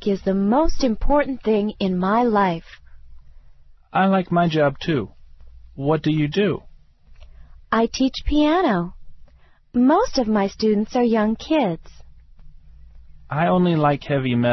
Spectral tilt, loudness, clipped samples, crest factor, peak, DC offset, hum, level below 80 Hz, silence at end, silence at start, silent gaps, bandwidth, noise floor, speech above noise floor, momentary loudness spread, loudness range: -7 dB/octave; -20 LUFS; under 0.1%; 14 dB; -6 dBFS; under 0.1%; none; -36 dBFS; 0 s; 0 s; none; 6.2 kHz; -51 dBFS; 32 dB; 7 LU; 3 LU